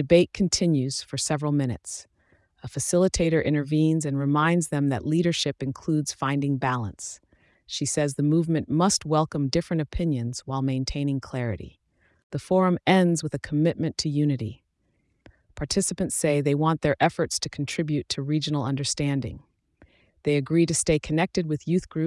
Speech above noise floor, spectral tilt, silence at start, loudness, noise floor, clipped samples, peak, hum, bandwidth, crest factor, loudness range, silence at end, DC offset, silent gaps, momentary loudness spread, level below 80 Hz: 46 dB; -5 dB/octave; 0 s; -25 LUFS; -70 dBFS; under 0.1%; -6 dBFS; none; 12 kHz; 18 dB; 3 LU; 0 s; under 0.1%; 12.23-12.30 s; 9 LU; -48 dBFS